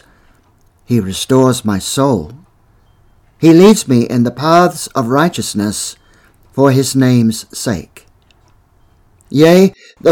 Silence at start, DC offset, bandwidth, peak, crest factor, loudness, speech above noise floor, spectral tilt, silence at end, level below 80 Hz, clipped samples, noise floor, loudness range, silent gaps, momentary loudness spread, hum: 0.9 s; under 0.1%; 18.5 kHz; 0 dBFS; 14 dB; -12 LUFS; 40 dB; -5.5 dB/octave; 0 s; -46 dBFS; 0.5%; -51 dBFS; 4 LU; none; 12 LU; none